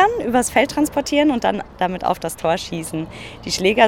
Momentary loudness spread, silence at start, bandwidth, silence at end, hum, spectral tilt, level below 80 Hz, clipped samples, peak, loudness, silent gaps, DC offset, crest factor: 10 LU; 0 s; 17.5 kHz; 0 s; none; -4 dB/octave; -44 dBFS; under 0.1%; -2 dBFS; -20 LUFS; none; under 0.1%; 18 dB